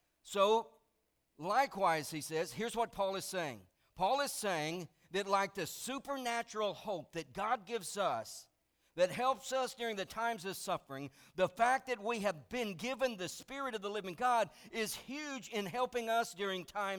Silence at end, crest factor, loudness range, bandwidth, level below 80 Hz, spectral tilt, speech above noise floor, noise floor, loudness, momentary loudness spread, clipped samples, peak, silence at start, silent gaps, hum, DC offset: 0 s; 20 dB; 2 LU; over 20 kHz; -72 dBFS; -3.5 dB/octave; 43 dB; -80 dBFS; -37 LUFS; 10 LU; under 0.1%; -18 dBFS; 0.25 s; none; none; under 0.1%